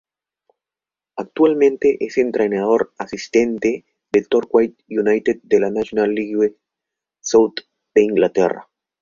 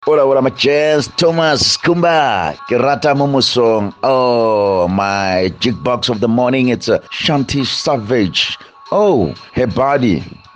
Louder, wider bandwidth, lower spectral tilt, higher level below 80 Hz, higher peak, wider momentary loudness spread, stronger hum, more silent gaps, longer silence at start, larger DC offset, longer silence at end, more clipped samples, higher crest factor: second, -18 LUFS vs -14 LUFS; second, 7.4 kHz vs 10 kHz; about the same, -5 dB/octave vs -5 dB/octave; second, -58 dBFS vs -46 dBFS; about the same, -2 dBFS vs -2 dBFS; first, 12 LU vs 5 LU; neither; neither; first, 1.15 s vs 0 s; neither; first, 0.4 s vs 0.2 s; neither; first, 16 dB vs 10 dB